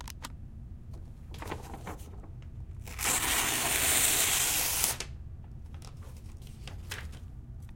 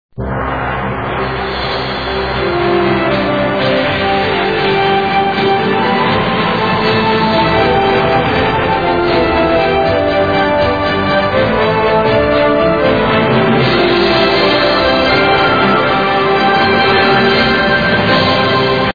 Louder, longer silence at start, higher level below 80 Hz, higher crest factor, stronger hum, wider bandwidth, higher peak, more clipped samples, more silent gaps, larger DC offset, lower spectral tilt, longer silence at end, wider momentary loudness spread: second, -26 LUFS vs -12 LUFS; second, 0 s vs 0.2 s; second, -46 dBFS vs -32 dBFS; first, 28 dB vs 12 dB; neither; first, 16.5 kHz vs 5 kHz; second, -4 dBFS vs 0 dBFS; neither; neither; second, under 0.1% vs 0.9%; second, -1 dB/octave vs -7 dB/octave; about the same, 0 s vs 0 s; first, 23 LU vs 7 LU